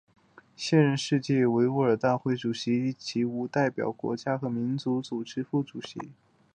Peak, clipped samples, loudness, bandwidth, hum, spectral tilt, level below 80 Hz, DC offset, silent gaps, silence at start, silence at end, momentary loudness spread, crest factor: -8 dBFS; under 0.1%; -28 LUFS; 9.6 kHz; none; -6.5 dB/octave; -70 dBFS; under 0.1%; none; 0.6 s; 0.4 s; 11 LU; 20 dB